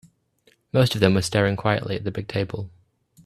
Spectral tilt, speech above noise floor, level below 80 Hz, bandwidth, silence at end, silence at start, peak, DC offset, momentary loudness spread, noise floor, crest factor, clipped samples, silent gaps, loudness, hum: -6 dB/octave; 41 dB; -52 dBFS; 14 kHz; 0.55 s; 0.75 s; -2 dBFS; under 0.1%; 11 LU; -62 dBFS; 22 dB; under 0.1%; none; -23 LUFS; none